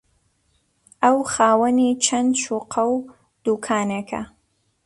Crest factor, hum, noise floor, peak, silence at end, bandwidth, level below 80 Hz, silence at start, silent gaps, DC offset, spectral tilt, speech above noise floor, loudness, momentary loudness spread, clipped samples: 18 dB; none; -66 dBFS; -4 dBFS; 0.6 s; 11.5 kHz; -60 dBFS; 1 s; none; under 0.1%; -3.5 dB/octave; 46 dB; -20 LUFS; 11 LU; under 0.1%